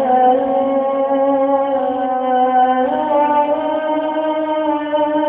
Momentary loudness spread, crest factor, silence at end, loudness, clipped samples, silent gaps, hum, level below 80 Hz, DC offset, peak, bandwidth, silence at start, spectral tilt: 5 LU; 12 dB; 0 s; -16 LUFS; under 0.1%; none; none; -58 dBFS; under 0.1%; -4 dBFS; 4 kHz; 0 s; -8.5 dB/octave